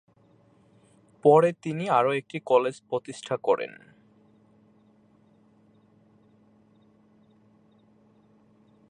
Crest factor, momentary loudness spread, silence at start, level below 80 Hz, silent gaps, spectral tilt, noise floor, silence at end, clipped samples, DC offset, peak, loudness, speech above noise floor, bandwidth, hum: 22 dB; 14 LU; 1.25 s; -78 dBFS; none; -6.5 dB/octave; -61 dBFS; 5.2 s; under 0.1%; under 0.1%; -6 dBFS; -25 LUFS; 37 dB; 10 kHz; none